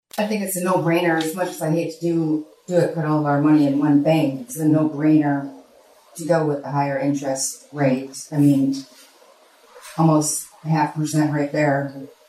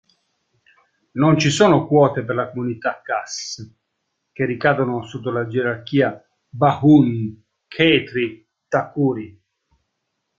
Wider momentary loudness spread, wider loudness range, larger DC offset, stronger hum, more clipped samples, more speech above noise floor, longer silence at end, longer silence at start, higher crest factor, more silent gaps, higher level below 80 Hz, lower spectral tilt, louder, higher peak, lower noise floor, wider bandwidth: second, 9 LU vs 15 LU; about the same, 4 LU vs 5 LU; neither; neither; neither; second, 32 dB vs 57 dB; second, 0.2 s vs 1.1 s; second, 0.15 s vs 1.15 s; about the same, 16 dB vs 18 dB; neither; second, -68 dBFS vs -56 dBFS; about the same, -6 dB/octave vs -6 dB/octave; about the same, -20 LUFS vs -19 LUFS; second, -6 dBFS vs -2 dBFS; second, -52 dBFS vs -75 dBFS; first, 15 kHz vs 9 kHz